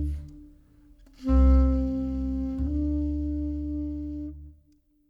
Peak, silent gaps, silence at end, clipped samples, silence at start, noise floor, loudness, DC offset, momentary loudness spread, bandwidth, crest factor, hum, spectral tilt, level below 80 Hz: -12 dBFS; none; 0.55 s; under 0.1%; 0 s; -63 dBFS; -27 LUFS; under 0.1%; 17 LU; 4.8 kHz; 16 dB; none; -10.5 dB/octave; -28 dBFS